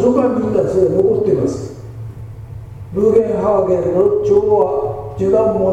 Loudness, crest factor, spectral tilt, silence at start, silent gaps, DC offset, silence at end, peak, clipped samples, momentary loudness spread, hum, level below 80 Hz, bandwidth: -15 LUFS; 14 dB; -9 dB/octave; 0 s; none; under 0.1%; 0 s; 0 dBFS; under 0.1%; 18 LU; none; -40 dBFS; 8.6 kHz